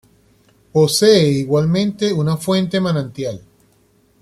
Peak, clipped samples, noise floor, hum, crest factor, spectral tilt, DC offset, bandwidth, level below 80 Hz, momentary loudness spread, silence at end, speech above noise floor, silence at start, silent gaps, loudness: -2 dBFS; under 0.1%; -56 dBFS; none; 16 dB; -5.5 dB/octave; under 0.1%; 15.5 kHz; -52 dBFS; 14 LU; 0.8 s; 41 dB; 0.75 s; none; -16 LUFS